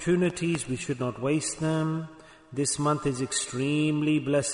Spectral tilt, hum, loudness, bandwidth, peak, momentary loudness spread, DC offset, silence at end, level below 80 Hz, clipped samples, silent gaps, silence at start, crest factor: -5 dB/octave; none; -27 LUFS; 11 kHz; -14 dBFS; 6 LU; under 0.1%; 0 s; -58 dBFS; under 0.1%; none; 0 s; 14 dB